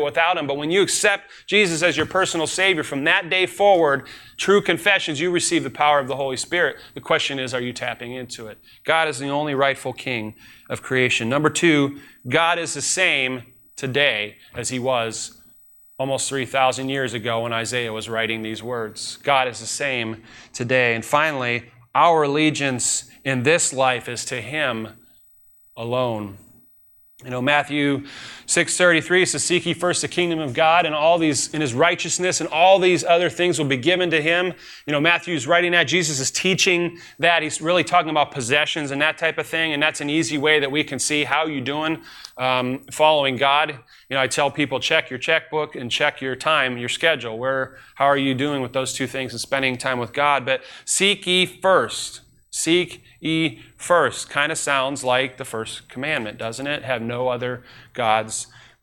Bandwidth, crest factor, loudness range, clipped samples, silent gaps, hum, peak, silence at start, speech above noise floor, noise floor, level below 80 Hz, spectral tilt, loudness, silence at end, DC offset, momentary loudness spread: 17 kHz; 18 dB; 5 LU; under 0.1%; none; none; -4 dBFS; 0 s; 32 dB; -53 dBFS; -60 dBFS; -3 dB/octave; -20 LUFS; 0.35 s; under 0.1%; 12 LU